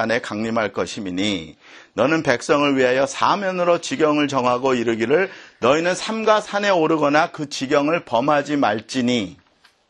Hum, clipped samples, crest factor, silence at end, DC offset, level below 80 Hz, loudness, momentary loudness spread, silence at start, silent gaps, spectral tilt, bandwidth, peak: none; under 0.1%; 20 dB; 0.55 s; under 0.1%; -58 dBFS; -19 LUFS; 6 LU; 0 s; none; -4.5 dB/octave; 11 kHz; 0 dBFS